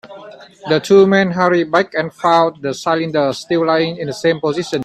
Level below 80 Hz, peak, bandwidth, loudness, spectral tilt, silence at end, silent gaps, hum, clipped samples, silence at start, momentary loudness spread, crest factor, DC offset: -58 dBFS; 0 dBFS; 12.5 kHz; -15 LUFS; -5.5 dB/octave; 0 s; none; none; under 0.1%; 0.05 s; 8 LU; 16 dB; under 0.1%